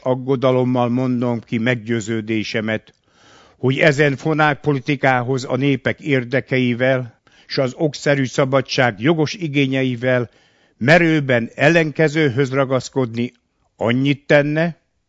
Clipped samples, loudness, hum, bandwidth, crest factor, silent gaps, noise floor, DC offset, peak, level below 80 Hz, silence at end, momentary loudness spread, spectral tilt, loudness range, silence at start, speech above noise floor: under 0.1%; -18 LUFS; none; 8 kHz; 18 dB; none; -50 dBFS; under 0.1%; 0 dBFS; -56 dBFS; 0.35 s; 8 LU; -6.5 dB/octave; 3 LU; 0.05 s; 32 dB